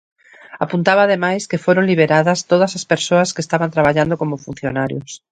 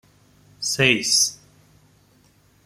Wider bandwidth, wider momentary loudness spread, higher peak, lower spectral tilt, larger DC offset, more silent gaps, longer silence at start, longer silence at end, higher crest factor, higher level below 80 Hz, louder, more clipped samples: second, 9.4 kHz vs 16 kHz; about the same, 10 LU vs 10 LU; about the same, 0 dBFS vs -2 dBFS; first, -5 dB/octave vs -1.5 dB/octave; neither; neither; about the same, 0.5 s vs 0.6 s; second, 0.15 s vs 1.3 s; second, 16 dB vs 24 dB; first, -52 dBFS vs -60 dBFS; first, -16 LUFS vs -19 LUFS; neither